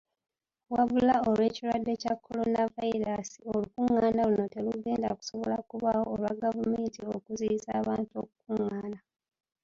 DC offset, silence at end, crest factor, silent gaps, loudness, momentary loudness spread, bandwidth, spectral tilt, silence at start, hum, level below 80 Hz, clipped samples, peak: under 0.1%; 0.65 s; 18 dB; none; -30 LUFS; 10 LU; 7.4 kHz; -6.5 dB/octave; 0.7 s; none; -62 dBFS; under 0.1%; -14 dBFS